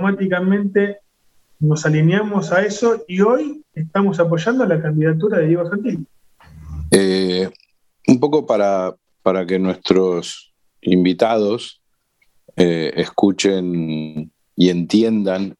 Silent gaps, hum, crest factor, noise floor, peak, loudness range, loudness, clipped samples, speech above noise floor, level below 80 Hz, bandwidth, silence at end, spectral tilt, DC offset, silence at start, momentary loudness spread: none; none; 18 dB; -63 dBFS; 0 dBFS; 2 LU; -17 LUFS; under 0.1%; 47 dB; -48 dBFS; 12.5 kHz; 0.05 s; -6 dB/octave; under 0.1%; 0 s; 11 LU